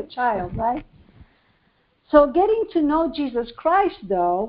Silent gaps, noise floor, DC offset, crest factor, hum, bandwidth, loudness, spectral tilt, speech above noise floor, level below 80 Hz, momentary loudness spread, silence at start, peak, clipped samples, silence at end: none; -64 dBFS; under 0.1%; 20 dB; none; 5.2 kHz; -21 LUFS; -10.5 dB/octave; 44 dB; -46 dBFS; 9 LU; 0 s; -2 dBFS; under 0.1%; 0 s